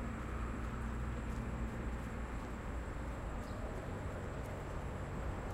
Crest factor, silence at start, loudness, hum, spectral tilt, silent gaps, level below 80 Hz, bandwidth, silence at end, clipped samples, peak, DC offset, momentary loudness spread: 12 dB; 0 s; -44 LUFS; none; -7 dB/octave; none; -44 dBFS; 14 kHz; 0 s; under 0.1%; -28 dBFS; under 0.1%; 2 LU